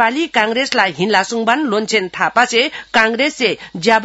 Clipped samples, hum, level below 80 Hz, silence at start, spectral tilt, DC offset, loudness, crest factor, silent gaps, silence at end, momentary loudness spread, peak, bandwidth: under 0.1%; none; -58 dBFS; 0 s; -3 dB/octave; under 0.1%; -15 LUFS; 16 dB; none; 0 s; 4 LU; 0 dBFS; 12 kHz